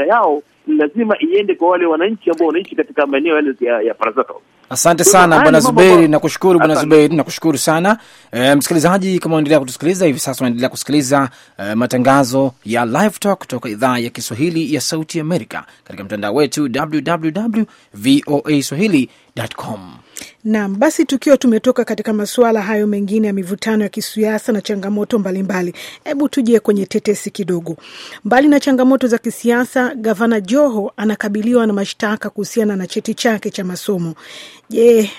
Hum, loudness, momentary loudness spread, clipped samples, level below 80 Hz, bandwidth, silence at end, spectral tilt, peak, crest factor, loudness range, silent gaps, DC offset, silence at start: none; -15 LUFS; 12 LU; under 0.1%; -54 dBFS; 16.5 kHz; 0 s; -5 dB/octave; 0 dBFS; 14 dB; 7 LU; none; under 0.1%; 0 s